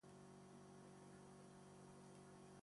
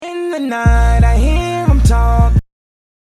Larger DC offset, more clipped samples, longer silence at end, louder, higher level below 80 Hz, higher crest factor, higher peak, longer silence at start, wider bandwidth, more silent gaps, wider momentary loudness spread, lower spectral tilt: neither; neither; second, 0 s vs 0.6 s; second, -63 LUFS vs -14 LUFS; second, -84 dBFS vs -14 dBFS; about the same, 12 dB vs 12 dB; second, -50 dBFS vs 0 dBFS; about the same, 0.05 s vs 0 s; about the same, 11.5 kHz vs 12 kHz; neither; second, 1 LU vs 7 LU; second, -5.5 dB/octave vs -7 dB/octave